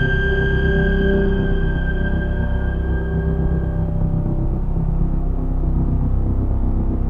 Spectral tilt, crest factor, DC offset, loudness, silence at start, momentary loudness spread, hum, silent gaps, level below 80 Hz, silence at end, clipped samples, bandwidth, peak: -9.5 dB/octave; 12 dB; under 0.1%; -21 LUFS; 0 s; 5 LU; none; none; -20 dBFS; 0 s; under 0.1%; 3.5 kHz; -6 dBFS